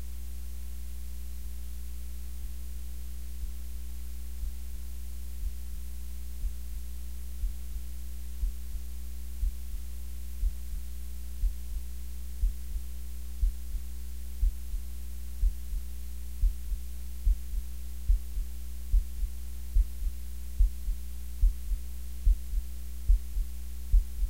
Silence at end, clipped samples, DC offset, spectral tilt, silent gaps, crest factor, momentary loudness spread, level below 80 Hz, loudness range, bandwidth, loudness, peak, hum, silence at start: 0 s; under 0.1%; 2%; -5 dB/octave; none; 20 dB; 10 LU; -32 dBFS; 7 LU; 16 kHz; -38 LUFS; -12 dBFS; none; 0 s